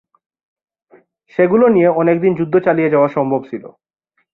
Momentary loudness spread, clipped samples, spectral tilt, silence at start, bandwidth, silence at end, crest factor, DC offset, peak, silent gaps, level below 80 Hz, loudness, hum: 12 LU; under 0.1%; -10.5 dB/octave; 1.4 s; 4.1 kHz; 0.65 s; 14 dB; under 0.1%; -2 dBFS; none; -60 dBFS; -14 LUFS; none